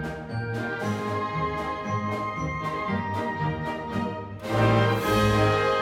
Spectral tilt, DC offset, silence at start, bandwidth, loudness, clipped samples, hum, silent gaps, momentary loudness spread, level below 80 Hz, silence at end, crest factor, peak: -6.5 dB/octave; under 0.1%; 0 s; 16.5 kHz; -26 LUFS; under 0.1%; none; none; 9 LU; -44 dBFS; 0 s; 16 dB; -10 dBFS